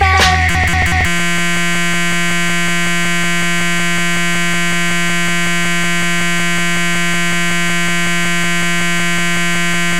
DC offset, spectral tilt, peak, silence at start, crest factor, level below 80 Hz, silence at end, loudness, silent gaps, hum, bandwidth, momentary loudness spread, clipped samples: 10%; -3 dB/octave; 0 dBFS; 0 s; 16 dB; -30 dBFS; 0 s; -14 LUFS; none; none; 16 kHz; 2 LU; under 0.1%